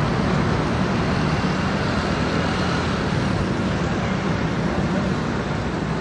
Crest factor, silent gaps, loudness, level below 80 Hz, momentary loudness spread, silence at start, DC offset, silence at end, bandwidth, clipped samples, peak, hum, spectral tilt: 14 dB; none; -22 LUFS; -36 dBFS; 3 LU; 0 s; under 0.1%; 0 s; 10.5 kHz; under 0.1%; -8 dBFS; none; -6.5 dB/octave